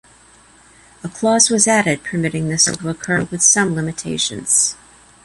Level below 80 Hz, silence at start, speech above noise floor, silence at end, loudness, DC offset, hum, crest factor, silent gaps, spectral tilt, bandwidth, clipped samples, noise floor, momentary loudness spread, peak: -52 dBFS; 1.05 s; 31 dB; 0.5 s; -15 LUFS; under 0.1%; none; 18 dB; none; -2.5 dB/octave; 12 kHz; under 0.1%; -48 dBFS; 11 LU; 0 dBFS